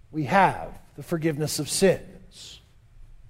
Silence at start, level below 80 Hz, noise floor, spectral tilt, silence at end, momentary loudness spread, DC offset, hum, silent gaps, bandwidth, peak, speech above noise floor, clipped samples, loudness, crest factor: 0.1 s; -48 dBFS; -50 dBFS; -4.5 dB/octave; 0.25 s; 23 LU; under 0.1%; none; none; 16 kHz; -4 dBFS; 26 dB; under 0.1%; -24 LUFS; 22 dB